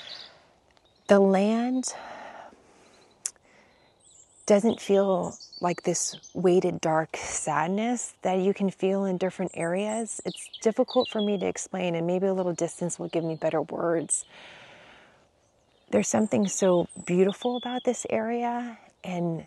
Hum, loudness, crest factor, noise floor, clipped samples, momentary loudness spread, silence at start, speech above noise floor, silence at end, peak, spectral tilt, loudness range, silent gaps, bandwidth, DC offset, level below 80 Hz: none; -27 LUFS; 20 dB; -65 dBFS; under 0.1%; 13 LU; 0 s; 39 dB; 0 s; -6 dBFS; -5 dB/octave; 4 LU; none; 12 kHz; under 0.1%; -68 dBFS